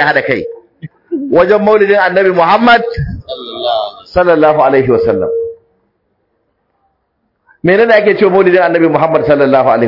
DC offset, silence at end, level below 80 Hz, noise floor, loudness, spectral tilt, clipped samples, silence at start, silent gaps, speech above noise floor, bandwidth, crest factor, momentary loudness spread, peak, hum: under 0.1%; 0 s; -40 dBFS; -63 dBFS; -10 LUFS; -8 dB/octave; 0.2%; 0 s; none; 55 dB; 6 kHz; 10 dB; 13 LU; 0 dBFS; none